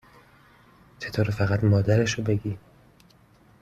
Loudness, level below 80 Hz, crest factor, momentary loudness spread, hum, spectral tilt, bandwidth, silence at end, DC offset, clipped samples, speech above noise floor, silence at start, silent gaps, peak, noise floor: -24 LUFS; -52 dBFS; 18 dB; 15 LU; none; -6.5 dB/octave; 7.8 kHz; 1.05 s; under 0.1%; under 0.1%; 34 dB; 1 s; none; -8 dBFS; -57 dBFS